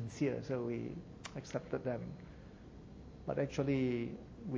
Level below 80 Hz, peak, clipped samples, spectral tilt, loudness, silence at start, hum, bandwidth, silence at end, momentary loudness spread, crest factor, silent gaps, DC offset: -60 dBFS; -20 dBFS; under 0.1%; -7 dB/octave; -40 LUFS; 0 s; none; 8 kHz; 0 s; 19 LU; 20 dB; none; under 0.1%